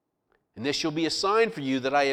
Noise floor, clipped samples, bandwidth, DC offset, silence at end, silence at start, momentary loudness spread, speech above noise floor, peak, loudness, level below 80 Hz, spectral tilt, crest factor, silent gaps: -73 dBFS; under 0.1%; 14 kHz; under 0.1%; 0 s; 0.55 s; 6 LU; 47 dB; -10 dBFS; -26 LUFS; -64 dBFS; -4 dB/octave; 16 dB; none